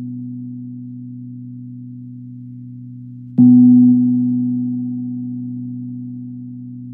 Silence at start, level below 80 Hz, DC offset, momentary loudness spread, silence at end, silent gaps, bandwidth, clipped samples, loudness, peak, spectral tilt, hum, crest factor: 0 s; -68 dBFS; under 0.1%; 24 LU; 0 s; none; 0.9 kHz; under 0.1%; -14 LUFS; -2 dBFS; -14 dB/octave; none; 16 dB